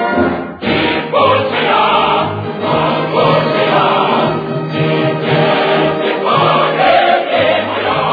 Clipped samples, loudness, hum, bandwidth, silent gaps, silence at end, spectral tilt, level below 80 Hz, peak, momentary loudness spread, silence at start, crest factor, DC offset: under 0.1%; -12 LUFS; none; 5 kHz; none; 0 s; -8 dB/octave; -46 dBFS; 0 dBFS; 6 LU; 0 s; 12 dB; under 0.1%